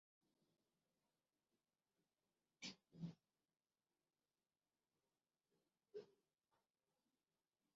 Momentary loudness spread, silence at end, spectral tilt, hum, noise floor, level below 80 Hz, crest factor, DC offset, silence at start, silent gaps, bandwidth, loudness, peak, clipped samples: 5 LU; 1.65 s; -4.5 dB/octave; none; under -90 dBFS; under -90 dBFS; 24 dB; under 0.1%; 2.6 s; none; 6.2 kHz; -58 LUFS; -42 dBFS; under 0.1%